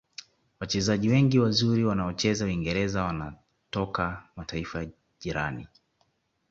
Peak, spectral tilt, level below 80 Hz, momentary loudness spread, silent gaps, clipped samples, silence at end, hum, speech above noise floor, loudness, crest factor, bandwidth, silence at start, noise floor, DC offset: -10 dBFS; -5.5 dB/octave; -48 dBFS; 18 LU; none; under 0.1%; 0.85 s; none; 45 dB; -27 LUFS; 18 dB; 8 kHz; 0.6 s; -72 dBFS; under 0.1%